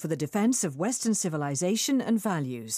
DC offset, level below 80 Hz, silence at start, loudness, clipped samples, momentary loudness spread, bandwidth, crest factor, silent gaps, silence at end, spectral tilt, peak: under 0.1%; -74 dBFS; 0 s; -27 LUFS; under 0.1%; 4 LU; 15.5 kHz; 12 dB; none; 0 s; -4.5 dB/octave; -14 dBFS